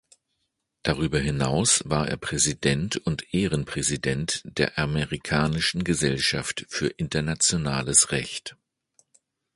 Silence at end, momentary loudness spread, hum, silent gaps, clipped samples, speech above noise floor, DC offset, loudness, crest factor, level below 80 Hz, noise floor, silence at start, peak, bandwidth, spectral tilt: 1 s; 8 LU; none; none; under 0.1%; 53 dB; under 0.1%; -24 LUFS; 22 dB; -44 dBFS; -78 dBFS; 0.85 s; -4 dBFS; 11.5 kHz; -3.5 dB/octave